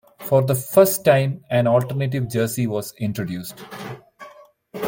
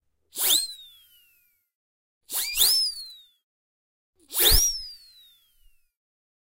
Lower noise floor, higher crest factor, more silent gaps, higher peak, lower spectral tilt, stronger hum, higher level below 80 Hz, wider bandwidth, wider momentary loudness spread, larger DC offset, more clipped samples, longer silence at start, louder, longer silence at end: second, -47 dBFS vs -66 dBFS; second, 18 dB vs 26 dB; second, none vs 1.75-2.21 s, 3.43-4.13 s; about the same, -2 dBFS vs -4 dBFS; first, -6 dB/octave vs 0 dB/octave; neither; second, -60 dBFS vs -38 dBFS; about the same, 17 kHz vs 16 kHz; about the same, 19 LU vs 21 LU; neither; neither; second, 0.2 s vs 0.35 s; about the same, -20 LUFS vs -21 LUFS; second, 0 s vs 1.55 s